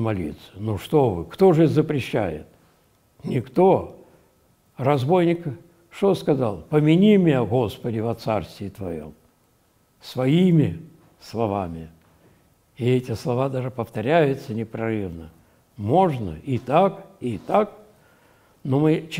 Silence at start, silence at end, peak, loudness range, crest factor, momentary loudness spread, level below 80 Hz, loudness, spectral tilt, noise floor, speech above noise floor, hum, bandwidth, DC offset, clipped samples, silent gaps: 0 s; 0 s; -4 dBFS; 4 LU; 18 dB; 16 LU; -54 dBFS; -22 LUFS; -8 dB/octave; -62 dBFS; 41 dB; none; 16 kHz; under 0.1%; under 0.1%; none